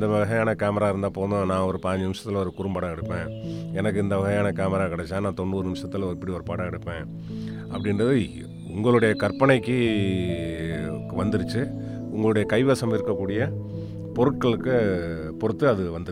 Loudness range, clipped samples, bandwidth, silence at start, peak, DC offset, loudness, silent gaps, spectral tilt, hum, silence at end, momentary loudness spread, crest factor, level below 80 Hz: 5 LU; under 0.1%; 13.5 kHz; 0 s; -4 dBFS; under 0.1%; -25 LUFS; none; -7 dB/octave; none; 0 s; 11 LU; 20 dB; -50 dBFS